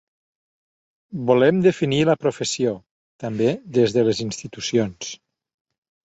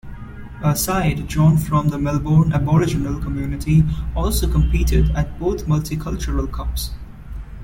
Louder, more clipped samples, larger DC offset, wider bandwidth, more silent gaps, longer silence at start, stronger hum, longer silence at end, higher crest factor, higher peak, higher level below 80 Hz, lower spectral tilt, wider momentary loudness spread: about the same, -21 LUFS vs -19 LUFS; neither; neither; second, 8.2 kHz vs 17 kHz; first, 2.91-3.19 s vs none; first, 1.1 s vs 0.05 s; neither; first, 0.95 s vs 0 s; first, 20 dB vs 14 dB; about the same, -4 dBFS vs -4 dBFS; second, -58 dBFS vs -24 dBFS; about the same, -5.5 dB/octave vs -6.5 dB/octave; first, 17 LU vs 13 LU